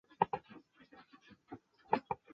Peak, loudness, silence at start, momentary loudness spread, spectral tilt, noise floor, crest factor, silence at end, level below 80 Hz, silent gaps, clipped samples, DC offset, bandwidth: -14 dBFS; -38 LUFS; 0.2 s; 24 LU; -4.5 dB/octave; -63 dBFS; 28 dB; 0.2 s; -74 dBFS; none; under 0.1%; under 0.1%; 6.6 kHz